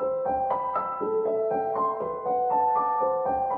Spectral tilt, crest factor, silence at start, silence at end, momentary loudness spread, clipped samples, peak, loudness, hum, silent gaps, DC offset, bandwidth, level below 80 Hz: -10 dB/octave; 12 dB; 0 s; 0 s; 4 LU; under 0.1%; -14 dBFS; -26 LUFS; none; none; under 0.1%; 3.4 kHz; -60 dBFS